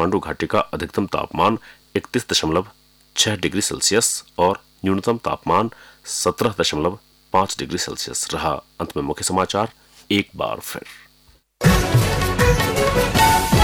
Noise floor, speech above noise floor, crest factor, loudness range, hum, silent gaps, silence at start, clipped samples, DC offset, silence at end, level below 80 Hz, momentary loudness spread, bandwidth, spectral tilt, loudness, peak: -55 dBFS; 34 dB; 16 dB; 3 LU; none; none; 0 s; under 0.1%; under 0.1%; 0 s; -34 dBFS; 11 LU; over 20 kHz; -4 dB/octave; -20 LUFS; -6 dBFS